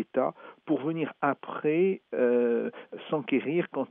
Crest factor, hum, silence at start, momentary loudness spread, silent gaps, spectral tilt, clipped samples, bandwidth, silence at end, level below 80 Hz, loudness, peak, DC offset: 18 dB; none; 0 s; 8 LU; none; -5.5 dB/octave; under 0.1%; 3.8 kHz; 0.05 s; -88 dBFS; -29 LUFS; -12 dBFS; under 0.1%